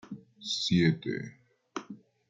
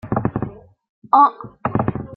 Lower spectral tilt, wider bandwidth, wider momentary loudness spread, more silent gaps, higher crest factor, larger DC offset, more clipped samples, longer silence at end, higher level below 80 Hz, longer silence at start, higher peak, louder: second, -5.5 dB/octave vs -11 dB/octave; first, 7.8 kHz vs 4.4 kHz; first, 21 LU vs 14 LU; second, none vs 0.89-1.02 s; about the same, 20 dB vs 18 dB; neither; neither; first, 0.35 s vs 0 s; second, -64 dBFS vs -46 dBFS; about the same, 0.05 s vs 0.05 s; second, -14 dBFS vs -2 dBFS; second, -29 LUFS vs -19 LUFS